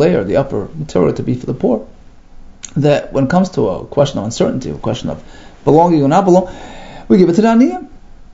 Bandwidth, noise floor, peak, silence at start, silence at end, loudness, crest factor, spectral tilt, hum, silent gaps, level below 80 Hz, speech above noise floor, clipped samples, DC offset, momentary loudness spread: 8 kHz; -36 dBFS; 0 dBFS; 0 s; 0.1 s; -14 LUFS; 14 dB; -7 dB/octave; none; none; -38 dBFS; 23 dB; under 0.1%; under 0.1%; 15 LU